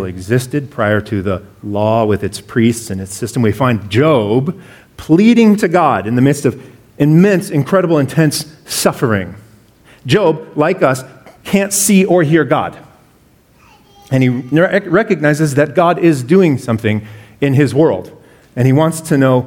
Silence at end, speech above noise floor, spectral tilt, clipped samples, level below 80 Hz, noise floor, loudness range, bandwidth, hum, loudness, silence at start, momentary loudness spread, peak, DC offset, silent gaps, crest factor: 0 s; 37 dB; -6 dB/octave; under 0.1%; -50 dBFS; -49 dBFS; 3 LU; 18 kHz; none; -13 LUFS; 0 s; 11 LU; 0 dBFS; under 0.1%; none; 14 dB